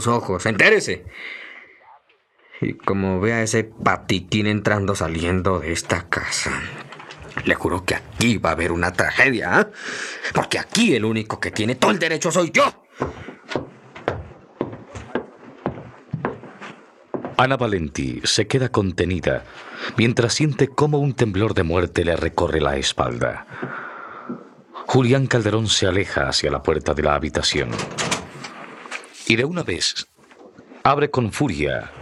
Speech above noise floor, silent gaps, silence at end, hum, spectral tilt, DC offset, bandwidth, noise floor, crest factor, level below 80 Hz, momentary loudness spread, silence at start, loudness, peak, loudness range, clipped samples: 38 dB; none; 0 s; none; -4.5 dB/octave; under 0.1%; 13.5 kHz; -58 dBFS; 20 dB; -44 dBFS; 16 LU; 0 s; -21 LUFS; 0 dBFS; 5 LU; under 0.1%